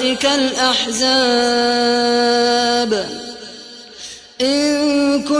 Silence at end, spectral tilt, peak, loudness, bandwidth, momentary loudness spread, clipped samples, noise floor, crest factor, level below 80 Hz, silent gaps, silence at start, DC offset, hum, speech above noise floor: 0 s; -2 dB/octave; -2 dBFS; -15 LUFS; 11 kHz; 18 LU; under 0.1%; -36 dBFS; 14 dB; -52 dBFS; none; 0 s; under 0.1%; none; 21 dB